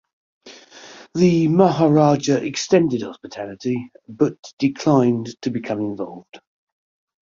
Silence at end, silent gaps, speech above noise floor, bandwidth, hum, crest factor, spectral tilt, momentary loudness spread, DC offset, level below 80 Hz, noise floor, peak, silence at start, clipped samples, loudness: 0.85 s; 4.39-4.43 s, 4.53-4.57 s; 24 dB; 7.6 kHz; none; 18 dB; -6.5 dB/octave; 17 LU; under 0.1%; -60 dBFS; -43 dBFS; -2 dBFS; 0.45 s; under 0.1%; -19 LUFS